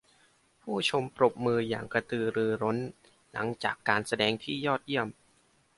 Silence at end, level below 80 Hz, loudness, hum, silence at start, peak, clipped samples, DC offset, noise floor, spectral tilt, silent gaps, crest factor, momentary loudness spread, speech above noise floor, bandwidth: 0.65 s; -68 dBFS; -30 LUFS; none; 0.65 s; -8 dBFS; under 0.1%; under 0.1%; -67 dBFS; -5 dB/octave; none; 24 dB; 9 LU; 37 dB; 11.5 kHz